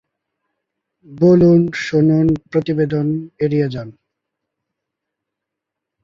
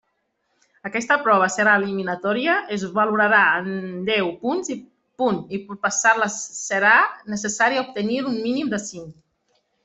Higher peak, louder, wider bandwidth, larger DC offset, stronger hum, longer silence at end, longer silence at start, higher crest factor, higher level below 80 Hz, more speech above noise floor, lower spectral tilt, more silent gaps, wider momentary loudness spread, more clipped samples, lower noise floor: about the same, -2 dBFS vs -4 dBFS; first, -16 LUFS vs -20 LUFS; second, 7.4 kHz vs 8.4 kHz; neither; neither; first, 2.15 s vs 0.7 s; first, 1.1 s vs 0.85 s; about the same, 16 dB vs 18 dB; first, -50 dBFS vs -66 dBFS; first, 67 dB vs 51 dB; first, -8.5 dB/octave vs -3.5 dB/octave; neither; about the same, 11 LU vs 13 LU; neither; first, -82 dBFS vs -72 dBFS